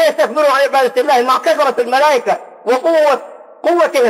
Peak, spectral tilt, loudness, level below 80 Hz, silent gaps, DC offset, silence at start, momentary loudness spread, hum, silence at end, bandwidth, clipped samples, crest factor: -2 dBFS; -2.5 dB/octave; -13 LUFS; -74 dBFS; none; under 0.1%; 0 s; 7 LU; none; 0 s; 16 kHz; under 0.1%; 10 dB